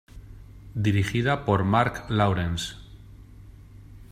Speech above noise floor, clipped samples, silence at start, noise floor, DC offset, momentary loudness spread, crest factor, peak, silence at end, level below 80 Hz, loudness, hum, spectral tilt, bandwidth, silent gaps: 23 dB; under 0.1%; 0.15 s; -46 dBFS; under 0.1%; 12 LU; 20 dB; -6 dBFS; 0.05 s; -46 dBFS; -25 LUFS; none; -6 dB/octave; 14 kHz; none